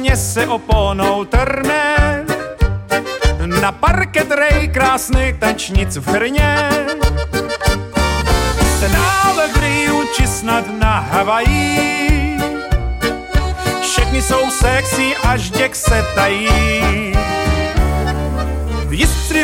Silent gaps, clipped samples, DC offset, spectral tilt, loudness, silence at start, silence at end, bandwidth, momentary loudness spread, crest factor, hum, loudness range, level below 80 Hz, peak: none; under 0.1%; under 0.1%; -4.5 dB/octave; -15 LUFS; 0 s; 0 s; 17 kHz; 6 LU; 14 dB; none; 2 LU; -20 dBFS; 0 dBFS